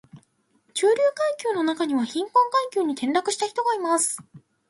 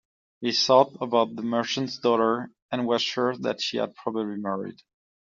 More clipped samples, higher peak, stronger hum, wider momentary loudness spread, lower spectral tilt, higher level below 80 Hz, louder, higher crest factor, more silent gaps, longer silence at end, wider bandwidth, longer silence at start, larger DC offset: neither; second, -8 dBFS vs -4 dBFS; neither; second, 5 LU vs 11 LU; about the same, -2.5 dB/octave vs -3 dB/octave; about the same, -76 dBFS vs -72 dBFS; about the same, -23 LUFS vs -25 LUFS; second, 16 dB vs 22 dB; second, none vs 2.62-2.69 s; second, 0.3 s vs 0.5 s; first, 12 kHz vs 7.6 kHz; second, 0.15 s vs 0.4 s; neither